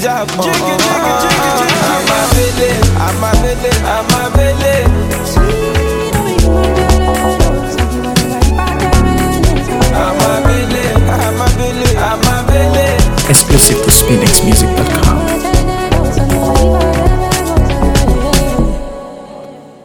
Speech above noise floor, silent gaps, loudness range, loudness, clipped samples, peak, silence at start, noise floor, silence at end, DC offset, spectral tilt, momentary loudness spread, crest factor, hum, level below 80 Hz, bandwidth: 21 dB; none; 4 LU; -11 LUFS; 0.4%; 0 dBFS; 0 s; -31 dBFS; 0.2 s; under 0.1%; -4.5 dB/octave; 6 LU; 10 dB; none; -16 dBFS; over 20 kHz